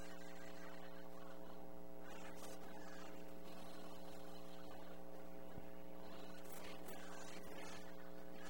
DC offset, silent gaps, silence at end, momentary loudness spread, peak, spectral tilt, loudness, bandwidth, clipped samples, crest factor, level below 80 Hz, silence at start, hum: 0.5%; none; 0 s; 3 LU; -36 dBFS; -4.5 dB/octave; -56 LUFS; 16 kHz; under 0.1%; 18 dB; -70 dBFS; 0 s; none